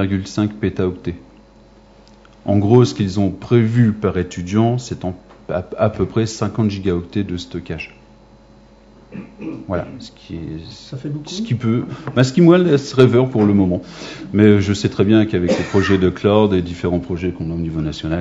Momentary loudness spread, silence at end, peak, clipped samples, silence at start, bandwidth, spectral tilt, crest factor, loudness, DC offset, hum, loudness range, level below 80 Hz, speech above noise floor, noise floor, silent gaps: 18 LU; 0 s; 0 dBFS; under 0.1%; 0 s; 7.8 kHz; -7 dB/octave; 18 dB; -17 LUFS; under 0.1%; none; 14 LU; -44 dBFS; 29 dB; -46 dBFS; none